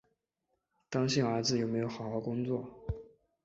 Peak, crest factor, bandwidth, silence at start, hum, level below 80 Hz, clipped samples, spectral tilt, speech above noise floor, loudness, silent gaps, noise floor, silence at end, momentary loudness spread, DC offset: -16 dBFS; 18 dB; 8 kHz; 0.9 s; none; -54 dBFS; under 0.1%; -5.5 dB/octave; 50 dB; -34 LUFS; none; -83 dBFS; 0.4 s; 12 LU; under 0.1%